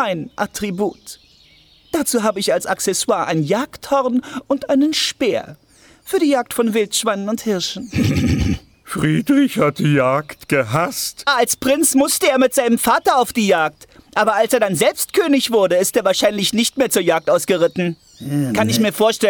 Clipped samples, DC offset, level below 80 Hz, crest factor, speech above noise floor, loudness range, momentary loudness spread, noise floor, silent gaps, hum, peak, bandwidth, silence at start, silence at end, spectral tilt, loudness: under 0.1%; under 0.1%; -42 dBFS; 16 dB; 33 dB; 4 LU; 8 LU; -50 dBFS; none; none; -2 dBFS; over 20 kHz; 0 s; 0 s; -4 dB/octave; -17 LUFS